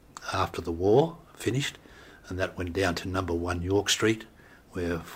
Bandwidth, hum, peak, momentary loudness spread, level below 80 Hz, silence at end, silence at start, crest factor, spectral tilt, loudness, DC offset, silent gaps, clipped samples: 16 kHz; none; -10 dBFS; 11 LU; -50 dBFS; 0 s; 0.15 s; 18 dB; -4.5 dB/octave; -28 LUFS; under 0.1%; none; under 0.1%